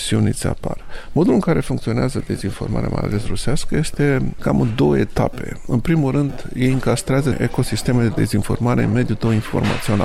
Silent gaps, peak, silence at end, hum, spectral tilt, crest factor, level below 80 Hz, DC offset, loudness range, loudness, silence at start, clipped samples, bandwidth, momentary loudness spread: none; -4 dBFS; 0 s; none; -6.5 dB/octave; 14 dB; -32 dBFS; under 0.1%; 2 LU; -19 LUFS; 0 s; under 0.1%; 14.5 kHz; 7 LU